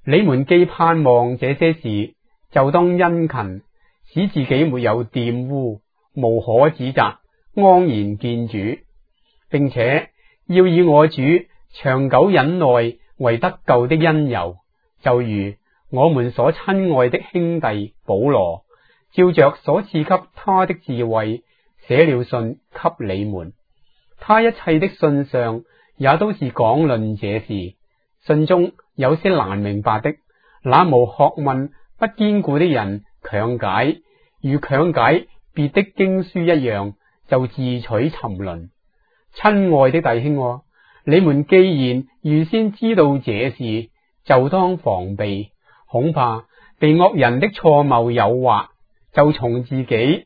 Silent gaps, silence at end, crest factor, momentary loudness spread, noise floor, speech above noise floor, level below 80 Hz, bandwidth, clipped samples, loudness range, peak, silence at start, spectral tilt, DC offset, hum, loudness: none; 0.05 s; 18 dB; 13 LU; -62 dBFS; 45 dB; -52 dBFS; 5 kHz; under 0.1%; 4 LU; 0 dBFS; 0.05 s; -10.5 dB/octave; under 0.1%; none; -17 LUFS